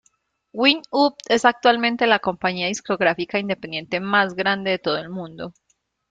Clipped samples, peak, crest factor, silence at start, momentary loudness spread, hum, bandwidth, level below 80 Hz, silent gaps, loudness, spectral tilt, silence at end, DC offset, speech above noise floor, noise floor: under 0.1%; -2 dBFS; 20 dB; 0.55 s; 13 LU; none; 9.4 kHz; -62 dBFS; none; -20 LUFS; -4 dB/octave; 0.6 s; under 0.1%; 45 dB; -66 dBFS